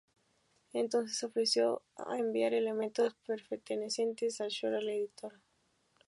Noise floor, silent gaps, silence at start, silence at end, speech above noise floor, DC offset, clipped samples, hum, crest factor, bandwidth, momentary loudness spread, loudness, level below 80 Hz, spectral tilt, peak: -75 dBFS; none; 0.75 s; 0.75 s; 41 dB; under 0.1%; under 0.1%; none; 16 dB; 11.5 kHz; 10 LU; -35 LUFS; -86 dBFS; -3 dB/octave; -18 dBFS